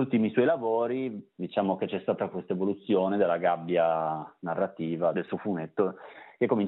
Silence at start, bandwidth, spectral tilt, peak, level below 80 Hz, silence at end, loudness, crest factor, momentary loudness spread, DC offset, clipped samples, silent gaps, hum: 0 s; 4.1 kHz; -6 dB/octave; -10 dBFS; -80 dBFS; 0 s; -29 LUFS; 18 dB; 8 LU; under 0.1%; under 0.1%; none; none